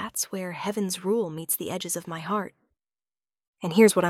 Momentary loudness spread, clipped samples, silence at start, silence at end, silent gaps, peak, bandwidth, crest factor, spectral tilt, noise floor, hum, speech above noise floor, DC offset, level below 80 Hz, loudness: 9 LU; under 0.1%; 0 s; 0 s; 3.47-3.54 s; -6 dBFS; 16.5 kHz; 22 dB; -4 dB/octave; under -90 dBFS; none; over 65 dB; under 0.1%; -70 dBFS; -27 LUFS